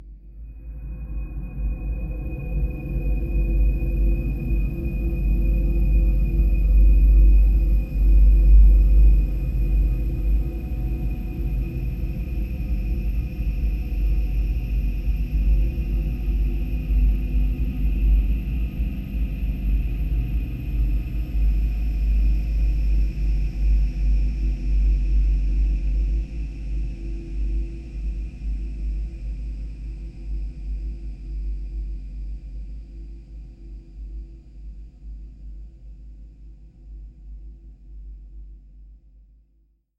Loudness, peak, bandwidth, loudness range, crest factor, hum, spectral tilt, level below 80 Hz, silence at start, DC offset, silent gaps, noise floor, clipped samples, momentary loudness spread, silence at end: -25 LUFS; -6 dBFS; 3 kHz; 22 LU; 16 dB; none; -9.5 dB/octave; -22 dBFS; 0 s; under 0.1%; none; -62 dBFS; under 0.1%; 22 LU; 1.05 s